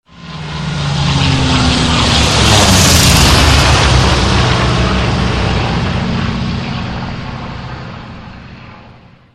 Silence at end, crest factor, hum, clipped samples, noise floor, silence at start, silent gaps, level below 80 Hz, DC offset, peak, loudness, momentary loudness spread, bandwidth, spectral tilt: 0.4 s; 12 dB; none; under 0.1%; -40 dBFS; 0.15 s; none; -20 dBFS; under 0.1%; 0 dBFS; -11 LUFS; 19 LU; 16 kHz; -4 dB/octave